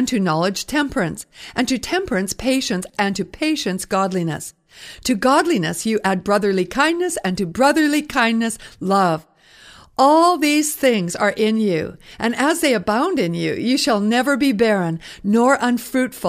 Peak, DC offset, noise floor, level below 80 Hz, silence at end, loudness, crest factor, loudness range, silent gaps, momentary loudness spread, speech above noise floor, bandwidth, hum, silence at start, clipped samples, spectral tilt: -2 dBFS; under 0.1%; -46 dBFS; -50 dBFS; 0 s; -19 LUFS; 18 dB; 4 LU; none; 9 LU; 28 dB; 15.5 kHz; none; 0 s; under 0.1%; -4.5 dB/octave